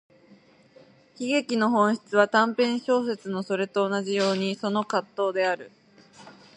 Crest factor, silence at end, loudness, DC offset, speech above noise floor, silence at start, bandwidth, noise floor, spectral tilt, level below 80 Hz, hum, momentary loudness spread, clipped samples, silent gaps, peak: 20 dB; 0.25 s; -25 LUFS; under 0.1%; 31 dB; 1.2 s; 10.5 kHz; -56 dBFS; -5 dB/octave; -78 dBFS; none; 8 LU; under 0.1%; none; -6 dBFS